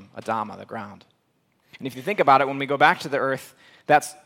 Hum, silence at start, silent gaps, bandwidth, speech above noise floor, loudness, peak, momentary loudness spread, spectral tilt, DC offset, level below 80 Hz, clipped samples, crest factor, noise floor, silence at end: none; 0 s; none; 16.5 kHz; 45 dB; -22 LUFS; -2 dBFS; 18 LU; -4.5 dB/octave; under 0.1%; -72 dBFS; under 0.1%; 22 dB; -68 dBFS; 0.15 s